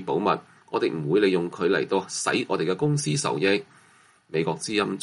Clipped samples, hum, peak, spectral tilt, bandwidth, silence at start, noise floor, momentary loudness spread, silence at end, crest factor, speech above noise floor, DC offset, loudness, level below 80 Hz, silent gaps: under 0.1%; none; -8 dBFS; -4.5 dB/octave; 11.5 kHz; 0 s; -57 dBFS; 5 LU; 0 s; 18 dB; 33 dB; under 0.1%; -25 LUFS; -66 dBFS; none